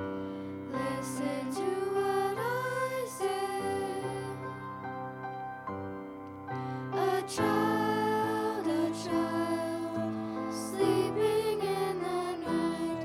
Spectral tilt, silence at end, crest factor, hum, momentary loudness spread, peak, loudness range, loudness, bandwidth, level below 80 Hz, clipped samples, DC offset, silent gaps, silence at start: -5.5 dB/octave; 0 s; 16 dB; none; 11 LU; -16 dBFS; 6 LU; -33 LUFS; 17 kHz; -66 dBFS; under 0.1%; under 0.1%; none; 0 s